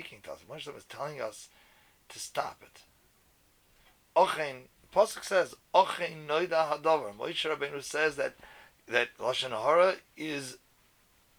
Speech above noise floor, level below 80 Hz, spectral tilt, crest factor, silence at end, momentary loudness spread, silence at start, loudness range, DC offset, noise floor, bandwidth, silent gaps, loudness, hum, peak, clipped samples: 36 dB; -70 dBFS; -3 dB/octave; 24 dB; 0.8 s; 17 LU; 0 s; 12 LU; under 0.1%; -66 dBFS; over 20 kHz; none; -30 LUFS; none; -8 dBFS; under 0.1%